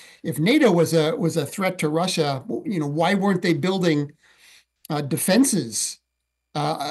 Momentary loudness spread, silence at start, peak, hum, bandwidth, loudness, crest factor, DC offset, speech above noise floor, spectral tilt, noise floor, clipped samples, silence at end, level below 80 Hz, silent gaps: 11 LU; 0.25 s; -6 dBFS; none; 13 kHz; -22 LUFS; 16 dB; under 0.1%; 57 dB; -5 dB/octave; -78 dBFS; under 0.1%; 0 s; -68 dBFS; none